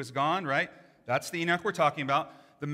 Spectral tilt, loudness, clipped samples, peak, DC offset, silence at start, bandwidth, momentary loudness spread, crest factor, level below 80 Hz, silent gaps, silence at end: -4.5 dB/octave; -29 LUFS; under 0.1%; -12 dBFS; under 0.1%; 0 s; 16 kHz; 13 LU; 18 dB; -76 dBFS; none; 0 s